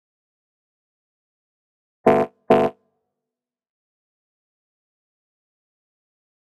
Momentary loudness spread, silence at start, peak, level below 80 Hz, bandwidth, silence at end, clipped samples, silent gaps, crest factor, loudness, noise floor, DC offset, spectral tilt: 3 LU; 2.05 s; 0 dBFS; -62 dBFS; 13 kHz; 3.7 s; under 0.1%; none; 26 dB; -20 LUFS; -88 dBFS; under 0.1%; -7.5 dB/octave